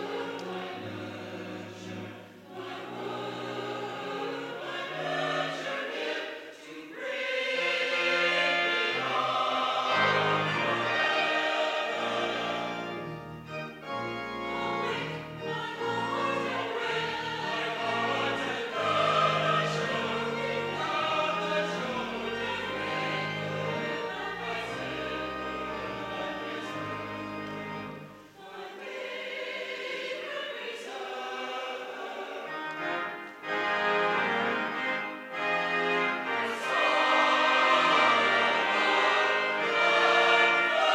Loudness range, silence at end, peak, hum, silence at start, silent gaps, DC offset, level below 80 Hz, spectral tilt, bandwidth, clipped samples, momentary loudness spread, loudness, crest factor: 13 LU; 0 s; -10 dBFS; none; 0 s; none; under 0.1%; -66 dBFS; -4 dB/octave; 16 kHz; under 0.1%; 15 LU; -29 LUFS; 20 dB